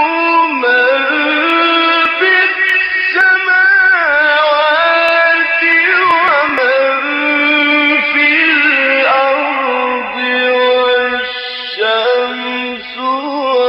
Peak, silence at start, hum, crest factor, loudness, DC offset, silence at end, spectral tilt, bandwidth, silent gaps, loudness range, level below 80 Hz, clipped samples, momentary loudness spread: 0 dBFS; 0 s; none; 12 dB; -10 LUFS; under 0.1%; 0 s; -3.5 dB/octave; 7.8 kHz; none; 4 LU; -56 dBFS; under 0.1%; 8 LU